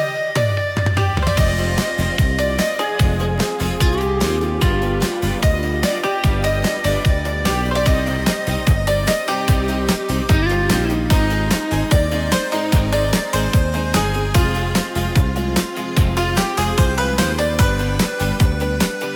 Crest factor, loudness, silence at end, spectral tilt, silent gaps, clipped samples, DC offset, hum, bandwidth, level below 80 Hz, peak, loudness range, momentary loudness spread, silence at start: 12 dB; -18 LUFS; 0 s; -5.5 dB/octave; none; under 0.1%; under 0.1%; none; 18 kHz; -24 dBFS; -4 dBFS; 1 LU; 3 LU; 0 s